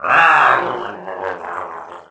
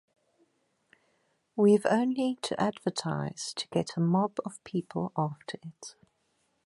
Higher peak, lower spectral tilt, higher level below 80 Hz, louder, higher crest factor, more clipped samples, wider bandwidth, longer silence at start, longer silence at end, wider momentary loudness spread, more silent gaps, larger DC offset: first, 0 dBFS vs -12 dBFS; second, -4 dB/octave vs -6 dB/octave; first, -60 dBFS vs -72 dBFS; first, -14 LUFS vs -30 LUFS; about the same, 16 dB vs 20 dB; neither; second, 8 kHz vs 11.5 kHz; second, 0 s vs 1.55 s; second, 0.1 s vs 0.75 s; about the same, 18 LU vs 18 LU; neither; neither